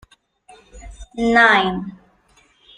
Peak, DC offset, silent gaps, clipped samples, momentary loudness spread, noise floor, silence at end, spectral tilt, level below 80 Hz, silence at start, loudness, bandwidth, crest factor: -2 dBFS; under 0.1%; none; under 0.1%; 23 LU; -57 dBFS; 0.85 s; -4.5 dB/octave; -44 dBFS; 0.75 s; -15 LUFS; 10 kHz; 20 dB